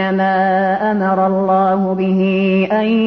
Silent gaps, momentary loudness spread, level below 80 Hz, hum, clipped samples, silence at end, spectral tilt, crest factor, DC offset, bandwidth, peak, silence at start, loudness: none; 2 LU; -58 dBFS; none; under 0.1%; 0 s; -9 dB/octave; 10 dB; 0.1%; 5.4 kHz; -4 dBFS; 0 s; -15 LUFS